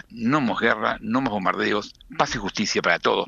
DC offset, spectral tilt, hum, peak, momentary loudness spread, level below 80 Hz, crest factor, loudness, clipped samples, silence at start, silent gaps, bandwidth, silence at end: under 0.1%; -4 dB/octave; none; -4 dBFS; 5 LU; -50 dBFS; 20 dB; -23 LUFS; under 0.1%; 0.1 s; none; 7.8 kHz; 0 s